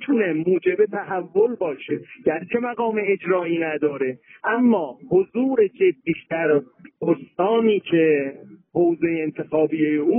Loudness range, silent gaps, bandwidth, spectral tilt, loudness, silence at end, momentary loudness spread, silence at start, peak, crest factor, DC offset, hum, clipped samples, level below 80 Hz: 2 LU; none; 3.6 kHz; -5.5 dB/octave; -22 LUFS; 0 s; 8 LU; 0 s; -6 dBFS; 14 dB; under 0.1%; none; under 0.1%; -66 dBFS